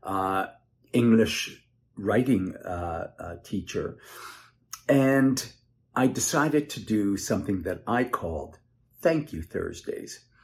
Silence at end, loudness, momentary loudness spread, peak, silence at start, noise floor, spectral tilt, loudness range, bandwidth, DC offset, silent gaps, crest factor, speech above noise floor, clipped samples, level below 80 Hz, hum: 0.25 s; -27 LUFS; 18 LU; -8 dBFS; 0.05 s; -46 dBFS; -5 dB/octave; 5 LU; 15 kHz; under 0.1%; none; 18 dB; 20 dB; under 0.1%; -56 dBFS; none